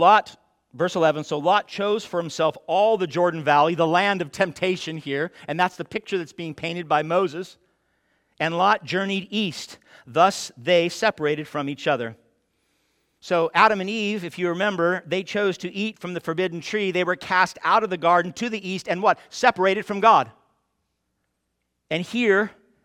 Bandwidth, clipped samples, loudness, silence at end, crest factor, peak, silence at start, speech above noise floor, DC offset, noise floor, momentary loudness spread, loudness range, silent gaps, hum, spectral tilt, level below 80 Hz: 16 kHz; under 0.1%; -22 LUFS; 0.35 s; 22 dB; -2 dBFS; 0 s; 54 dB; under 0.1%; -76 dBFS; 10 LU; 4 LU; none; none; -4.5 dB/octave; -68 dBFS